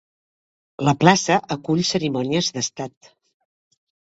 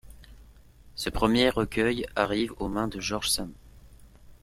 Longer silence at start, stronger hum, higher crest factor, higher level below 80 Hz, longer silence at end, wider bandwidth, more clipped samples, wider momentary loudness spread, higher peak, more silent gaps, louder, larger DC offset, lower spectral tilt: first, 0.8 s vs 0.05 s; neither; about the same, 22 dB vs 24 dB; second, -58 dBFS vs -46 dBFS; first, 1.2 s vs 0.1 s; second, 8 kHz vs 16 kHz; neither; about the same, 11 LU vs 10 LU; first, 0 dBFS vs -6 dBFS; neither; first, -20 LUFS vs -27 LUFS; neither; about the same, -4.5 dB/octave vs -4 dB/octave